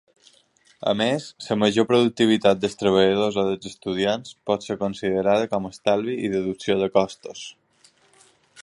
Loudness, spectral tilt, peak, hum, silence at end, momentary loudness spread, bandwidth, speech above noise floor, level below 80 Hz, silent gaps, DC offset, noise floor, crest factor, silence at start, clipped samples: -22 LUFS; -5.5 dB/octave; -4 dBFS; none; 1.1 s; 11 LU; 11.5 kHz; 37 dB; -58 dBFS; none; under 0.1%; -59 dBFS; 20 dB; 0.8 s; under 0.1%